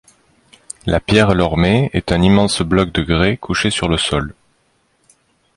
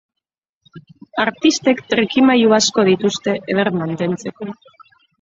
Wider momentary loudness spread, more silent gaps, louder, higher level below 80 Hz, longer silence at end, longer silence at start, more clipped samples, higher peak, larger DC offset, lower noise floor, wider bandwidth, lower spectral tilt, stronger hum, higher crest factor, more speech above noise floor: second, 8 LU vs 14 LU; neither; about the same, -15 LUFS vs -16 LUFS; first, -32 dBFS vs -60 dBFS; first, 1.25 s vs 0.7 s; about the same, 0.85 s vs 0.75 s; neither; about the same, 0 dBFS vs -2 dBFS; neither; second, -61 dBFS vs -72 dBFS; first, 11.5 kHz vs 7.8 kHz; first, -5.5 dB/octave vs -4 dB/octave; neither; about the same, 16 dB vs 16 dB; second, 46 dB vs 56 dB